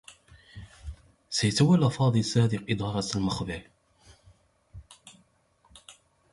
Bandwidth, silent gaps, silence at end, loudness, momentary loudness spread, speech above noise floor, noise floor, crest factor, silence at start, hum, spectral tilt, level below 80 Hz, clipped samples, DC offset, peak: 11.5 kHz; none; 0.4 s; -26 LUFS; 24 LU; 41 dB; -66 dBFS; 20 dB; 0.1 s; none; -5.5 dB/octave; -52 dBFS; under 0.1%; under 0.1%; -10 dBFS